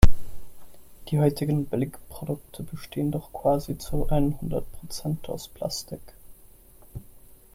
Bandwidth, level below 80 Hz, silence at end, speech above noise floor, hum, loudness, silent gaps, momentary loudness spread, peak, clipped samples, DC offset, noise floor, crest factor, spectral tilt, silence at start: 15.5 kHz; -32 dBFS; 0.35 s; 24 dB; none; -29 LUFS; none; 21 LU; -2 dBFS; under 0.1%; under 0.1%; -51 dBFS; 24 dB; -6.5 dB/octave; 0 s